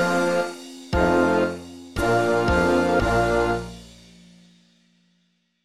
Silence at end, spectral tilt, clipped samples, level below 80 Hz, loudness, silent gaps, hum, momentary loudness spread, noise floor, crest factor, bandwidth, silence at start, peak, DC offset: 1.8 s; -6 dB/octave; under 0.1%; -38 dBFS; -21 LUFS; none; 60 Hz at -50 dBFS; 15 LU; -68 dBFS; 16 dB; 15 kHz; 0 s; -6 dBFS; under 0.1%